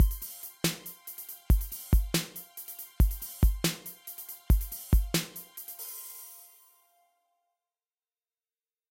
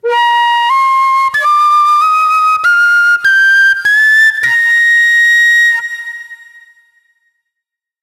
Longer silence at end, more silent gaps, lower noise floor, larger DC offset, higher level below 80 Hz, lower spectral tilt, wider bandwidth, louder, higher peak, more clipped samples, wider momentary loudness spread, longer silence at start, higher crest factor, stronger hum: first, 2.55 s vs 1.65 s; neither; first, under -90 dBFS vs -80 dBFS; neither; first, -32 dBFS vs -64 dBFS; first, -4.5 dB/octave vs 1.5 dB/octave; first, 17 kHz vs 14.5 kHz; second, -32 LUFS vs -7 LUFS; second, -14 dBFS vs -2 dBFS; neither; first, 14 LU vs 5 LU; about the same, 0 s vs 0.05 s; first, 18 dB vs 8 dB; neither